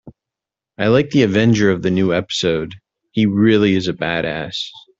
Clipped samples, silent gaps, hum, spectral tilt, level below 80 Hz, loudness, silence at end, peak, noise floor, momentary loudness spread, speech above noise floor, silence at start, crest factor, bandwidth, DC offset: under 0.1%; none; none; -6 dB/octave; -50 dBFS; -17 LUFS; 0.2 s; -2 dBFS; -86 dBFS; 10 LU; 70 dB; 0.05 s; 16 dB; 7.8 kHz; under 0.1%